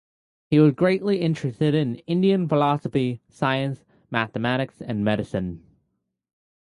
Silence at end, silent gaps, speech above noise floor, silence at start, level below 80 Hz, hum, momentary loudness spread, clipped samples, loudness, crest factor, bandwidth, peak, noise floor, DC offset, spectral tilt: 1.05 s; none; 53 dB; 0.5 s; -56 dBFS; none; 10 LU; under 0.1%; -23 LUFS; 18 dB; 11 kHz; -6 dBFS; -76 dBFS; under 0.1%; -8 dB/octave